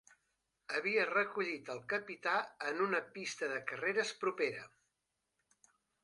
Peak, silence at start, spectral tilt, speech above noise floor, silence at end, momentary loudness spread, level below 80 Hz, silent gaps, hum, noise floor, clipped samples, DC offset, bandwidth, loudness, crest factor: -20 dBFS; 0.7 s; -3.5 dB/octave; 49 dB; 1.35 s; 9 LU; -86 dBFS; none; none; -86 dBFS; under 0.1%; under 0.1%; 11.5 kHz; -37 LUFS; 18 dB